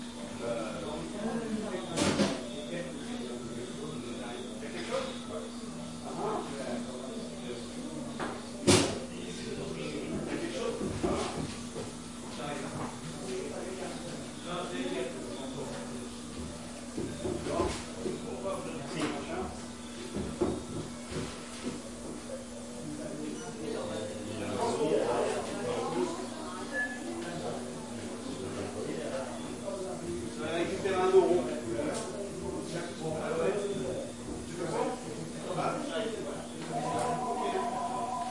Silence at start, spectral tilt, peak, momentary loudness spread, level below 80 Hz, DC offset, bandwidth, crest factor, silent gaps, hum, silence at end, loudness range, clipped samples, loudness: 0 s; -4.5 dB/octave; -10 dBFS; 9 LU; -58 dBFS; 0.2%; 11.5 kHz; 24 dB; none; none; 0 s; 7 LU; under 0.1%; -35 LUFS